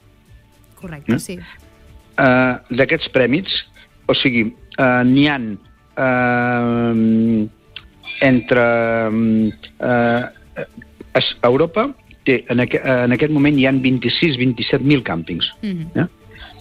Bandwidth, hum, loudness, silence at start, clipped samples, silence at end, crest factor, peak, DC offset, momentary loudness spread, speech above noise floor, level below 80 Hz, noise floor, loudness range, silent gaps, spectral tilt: 12.5 kHz; none; -17 LUFS; 0.85 s; under 0.1%; 0 s; 16 dB; -2 dBFS; under 0.1%; 15 LU; 31 dB; -46 dBFS; -47 dBFS; 2 LU; none; -7 dB/octave